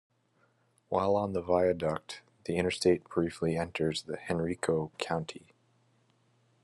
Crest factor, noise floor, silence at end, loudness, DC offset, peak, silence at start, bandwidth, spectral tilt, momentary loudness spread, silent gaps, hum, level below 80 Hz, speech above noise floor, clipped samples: 20 dB; -71 dBFS; 1.25 s; -31 LUFS; under 0.1%; -12 dBFS; 0.9 s; 12.5 kHz; -5.5 dB/octave; 9 LU; none; none; -66 dBFS; 40 dB; under 0.1%